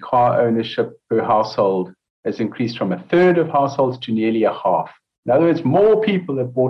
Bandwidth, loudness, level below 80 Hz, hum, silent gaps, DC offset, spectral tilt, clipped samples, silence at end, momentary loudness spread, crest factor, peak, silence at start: 6.4 kHz; -18 LUFS; -60 dBFS; none; 2.10-2.23 s, 5.18-5.23 s; under 0.1%; -8 dB/octave; under 0.1%; 0 s; 9 LU; 12 dB; -6 dBFS; 0 s